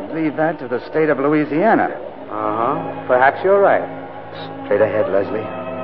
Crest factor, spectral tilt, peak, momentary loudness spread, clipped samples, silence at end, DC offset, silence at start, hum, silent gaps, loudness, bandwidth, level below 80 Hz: 16 dB; -10.5 dB/octave; -2 dBFS; 15 LU; under 0.1%; 0 s; 0.8%; 0 s; none; none; -17 LUFS; 5.4 kHz; -60 dBFS